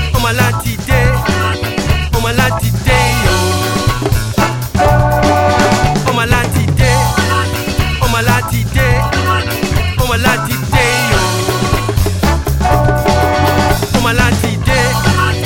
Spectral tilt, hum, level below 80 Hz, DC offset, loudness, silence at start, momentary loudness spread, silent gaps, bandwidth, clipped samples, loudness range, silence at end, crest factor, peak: -5 dB/octave; none; -20 dBFS; under 0.1%; -12 LUFS; 0 s; 4 LU; none; 17.5 kHz; under 0.1%; 1 LU; 0 s; 12 dB; 0 dBFS